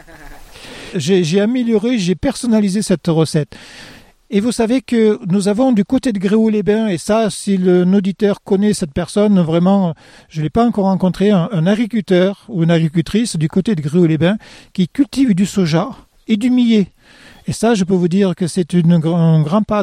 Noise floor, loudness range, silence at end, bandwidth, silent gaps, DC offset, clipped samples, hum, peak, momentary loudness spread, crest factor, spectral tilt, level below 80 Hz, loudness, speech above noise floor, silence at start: -36 dBFS; 2 LU; 0 s; 13 kHz; none; under 0.1%; under 0.1%; none; -2 dBFS; 8 LU; 12 dB; -6.5 dB/octave; -44 dBFS; -15 LUFS; 22 dB; 0.15 s